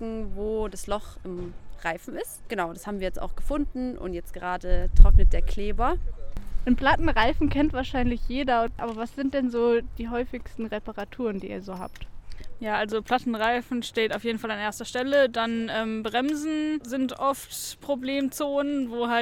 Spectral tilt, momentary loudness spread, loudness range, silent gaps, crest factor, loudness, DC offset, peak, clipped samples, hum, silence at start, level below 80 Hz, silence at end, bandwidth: -5.5 dB/octave; 13 LU; 7 LU; none; 24 dB; -27 LUFS; under 0.1%; 0 dBFS; under 0.1%; none; 0 s; -28 dBFS; 0 s; 14.5 kHz